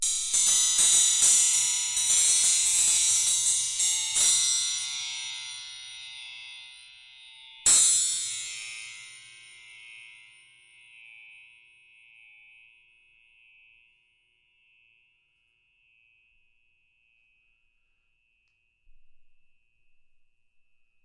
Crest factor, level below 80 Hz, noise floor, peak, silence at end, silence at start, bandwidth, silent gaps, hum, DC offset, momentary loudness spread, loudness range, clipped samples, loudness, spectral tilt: 20 dB; -66 dBFS; -72 dBFS; -8 dBFS; 1.9 s; 0 s; 12 kHz; none; none; under 0.1%; 23 LU; 14 LU; under 0.1%; -21 LUFS; 3.5 dB/octave